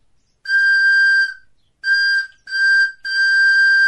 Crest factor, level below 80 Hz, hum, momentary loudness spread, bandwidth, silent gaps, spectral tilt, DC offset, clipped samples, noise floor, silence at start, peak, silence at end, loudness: 8 dB; -66 dBFS; none; 10 LU; 11.5 kHz; none; 5 dB/octave; under 0.1%; under 0.1%; -49 dBFS; 0.45 s; -8 dBFS; 0 s; -14 LUFS